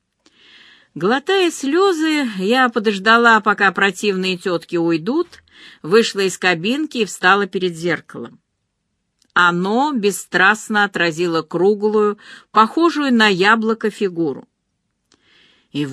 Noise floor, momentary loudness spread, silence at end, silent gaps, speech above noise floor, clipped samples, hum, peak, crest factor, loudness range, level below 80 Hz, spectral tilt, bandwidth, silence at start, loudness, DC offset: -72 dBFS; 9 LU; 0 s; none; 55 dB; under 0.1%; none; 0 dBFS; 18 dB; 4 LU; -66 dBFS; -4 dB/octave; 13.5 kHz; 0.95 s; -16 LUFS; under 0.1%